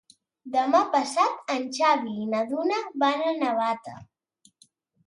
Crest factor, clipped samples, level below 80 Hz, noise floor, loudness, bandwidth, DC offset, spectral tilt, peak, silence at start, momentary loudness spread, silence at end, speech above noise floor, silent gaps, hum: 18 dB; under 0.1%; -76 dBFS; -64 dBFS; -25 LUFS; 11.5 kHz; under 0.1%; -4 dB/octave; -8 dBFS; 0.45 s; 7 LU; 1.05 s; 39 dB; none; none